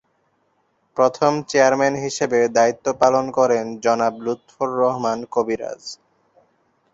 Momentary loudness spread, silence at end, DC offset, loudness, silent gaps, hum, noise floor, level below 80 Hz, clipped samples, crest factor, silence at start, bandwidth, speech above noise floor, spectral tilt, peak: 11 LU; 1 s; under 0.1%; -19 LUFS; none; none; -66 dBFS; -62 dBFS; under 0.1%; 18 dB; 0.95 s; 8 kHz; 47 dB; -4.5 dB/octave; -2 dBFS